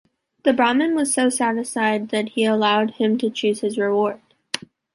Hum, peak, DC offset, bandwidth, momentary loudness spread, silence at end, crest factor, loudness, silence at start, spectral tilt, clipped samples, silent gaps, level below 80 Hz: none; -2 dBFS; under 0.1%; 11.5 kHz; 10 LU; 0.35 s; 18 dB; -20 LUFS; 0.45 s; -3.5 dB/octave; under 0.1%; none; -68 dBFS